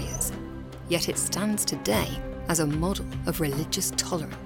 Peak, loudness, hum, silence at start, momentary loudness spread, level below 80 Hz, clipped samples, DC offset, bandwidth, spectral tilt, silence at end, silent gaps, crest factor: -10 dBFS; -27 LUFS; none; 0 s; 7 LU; -40 dBFS; under 0.1%; under 0.1%; 19.5 kHz; -3.5 dB/octave; 0 s; none; 18 dB